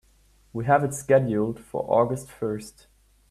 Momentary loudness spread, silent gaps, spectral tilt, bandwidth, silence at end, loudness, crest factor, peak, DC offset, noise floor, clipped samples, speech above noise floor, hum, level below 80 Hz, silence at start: 13 LU; none; -7 dB/octave; 13.5 kHz; 0.6 s; -25 LUFS; 20 dB; -6 dBFS; under 0.1%; -59 dBFS; under 0.1%; 35 dB; none; -56 dBFS; 0.55 s